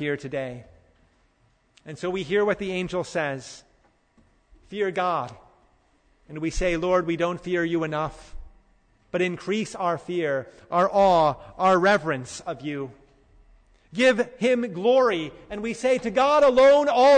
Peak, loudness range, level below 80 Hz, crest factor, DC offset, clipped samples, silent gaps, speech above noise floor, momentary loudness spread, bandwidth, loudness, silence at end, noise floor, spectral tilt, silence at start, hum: -10 dBFS; 7 LU; -46 dBFS; 14 dB; under 0.1%; under 0.1%; none; 42 dB; 15 LU; 9.6 kHz; -23 LUFS; 0 s; -64 dBFS; -5 dB/octave; 0 s; none